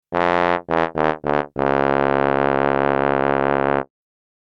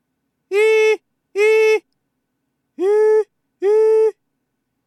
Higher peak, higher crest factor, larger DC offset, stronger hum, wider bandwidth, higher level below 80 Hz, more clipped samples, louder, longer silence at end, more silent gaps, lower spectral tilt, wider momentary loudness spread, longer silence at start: first, 0 dBFS vs -6 dBFS; first, 20 dB vs 12 dB; neither; neither; second, 7.2 kHz vs 12 kHz; first, -44 dBFS vs -90 dBFS; neither; second, -19 LUFS vs -16 LUFS; second, 0.6 s vs 0.75 s; neither; first, -7.5 dB/octave vs -1 dB/octave; second, 4 LU vs 9 LU; second, 0.1 s vs 0.5 s